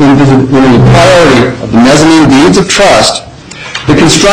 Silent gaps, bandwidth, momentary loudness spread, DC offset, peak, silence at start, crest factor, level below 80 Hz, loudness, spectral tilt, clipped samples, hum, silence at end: none; 15.5 kHz; 8 LU; 2%; 0 dBFS; 0 s; 4 dB; -26 dBFS; -4 LUFS; -5 dB/octave; 1%; none; 0 s